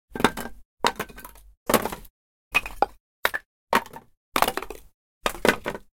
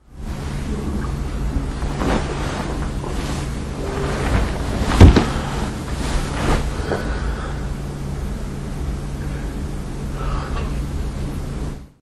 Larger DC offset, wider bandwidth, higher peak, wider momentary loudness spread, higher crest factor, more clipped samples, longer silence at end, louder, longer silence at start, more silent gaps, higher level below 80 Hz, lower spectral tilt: neither; first, 17 kHz vs 12.5 kHz; about the same, 0 dBFS vs 0 dBFS; first, 17 LU vs 7 LU; first, 28 dB vs 20 dB; neither; about the same, 0.15 s vs 0.15 s; second, -26 LUFS vs -22 LUFS; about the same, 0.1 s vs 0.1 s; first, 0.65-0.77 s, 1.57-1.66 s, 2.10-2.51 s, 3.00-3.23 s, 3.46-3.67 s, 4.17-4.32 s, 4.94-5.21 s vs none; second, -48 dBFS vs -24 dBFS; second, -3 dB/octave vs -6.5 dB/octave